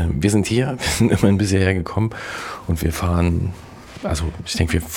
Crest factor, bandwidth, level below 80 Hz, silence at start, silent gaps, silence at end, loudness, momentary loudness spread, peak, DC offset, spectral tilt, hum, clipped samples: 16 dB; 17.5 kHz; -32 dBFS; 0 s; none; 0 s; -20 LUFS; 12 LU; -4 dBFS; under 0.1%; -5.5 dB/octave; none; under 0.1%